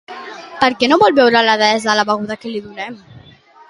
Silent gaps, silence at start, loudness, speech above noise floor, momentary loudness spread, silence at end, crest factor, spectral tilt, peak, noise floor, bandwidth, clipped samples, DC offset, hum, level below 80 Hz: none; 0.1 s; -13 LUFS; 30 dB; 19 LU; 0.5 s; 16 dB; -3.5 dB/octave; 0 dBFS; -44 dBFS; 11.5 kHz; under 0.1%; under 0.1%; none; -58 dBFS